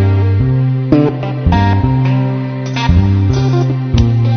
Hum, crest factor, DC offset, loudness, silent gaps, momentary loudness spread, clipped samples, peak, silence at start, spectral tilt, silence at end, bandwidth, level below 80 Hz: none; 12 dB; 0.4%; -13 LUFS; none; 5 LU; under 0.1%; 0 dBFS; 0 s; -8 dB/octave; 0 s; 6.6 kHz; -24 dBFS